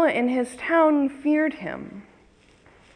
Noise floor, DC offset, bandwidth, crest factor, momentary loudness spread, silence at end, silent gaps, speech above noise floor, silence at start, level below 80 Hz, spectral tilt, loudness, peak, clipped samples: -56 dBFS; under 0.1%; 10.5 kHz; 16 dB; 15 LU; 0.95 s; none; 33 dB; 0 s; -62 dBFS; -5.5 dB/octave; -23 LUFS; -8 dBFS; under 0.1%